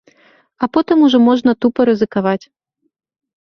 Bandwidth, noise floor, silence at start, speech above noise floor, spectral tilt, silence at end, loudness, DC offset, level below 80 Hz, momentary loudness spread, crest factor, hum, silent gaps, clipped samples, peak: 6.4 kHz; -53 dBFS; 0.6 s; 39 dB; -7 dB/octave; 1.05 s; -14 LUFS; under 0.1%; -56 dBFS; 9 LU; 14 dB; none; none; under 0.1%; 0 dBFS